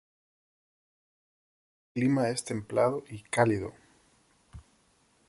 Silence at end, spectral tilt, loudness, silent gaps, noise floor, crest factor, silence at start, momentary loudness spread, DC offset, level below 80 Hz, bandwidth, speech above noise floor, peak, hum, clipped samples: 0.7 s; -6 dB/octave; -29 LUFS; none; -67 dBFS; 22 dB; 1.95 s; 12 LU; under 0.1%; -62 dBFS; 11.5 kHz; 39 dB; -10 dBFS; none; under 0.1%